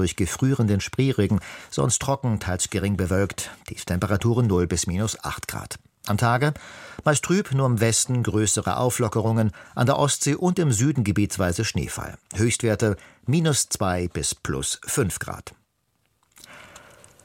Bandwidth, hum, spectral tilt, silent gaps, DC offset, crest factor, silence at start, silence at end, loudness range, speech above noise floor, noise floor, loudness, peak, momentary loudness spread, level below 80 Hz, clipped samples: 16.5 kHz; none; -5 dB/octave; none; under 0.1%; 18 dB; 0 s; 0.45 s; 3 LU; 47 dB; -70 dBFS; -23 LUFS; -6 dBFS; 11 LU; -46 dBFS; under 0.1%